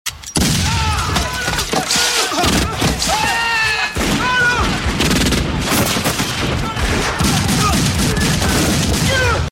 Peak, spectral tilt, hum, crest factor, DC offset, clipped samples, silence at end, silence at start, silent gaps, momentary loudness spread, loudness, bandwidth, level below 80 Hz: 0 dBFS; -3.5 dB/octave; none; 16 dB; under 0.1%; under 0.1%; 0 s; 0.05 s; none; 4 LU; -15 LUFS; 16.5 kHz; -26 dBFS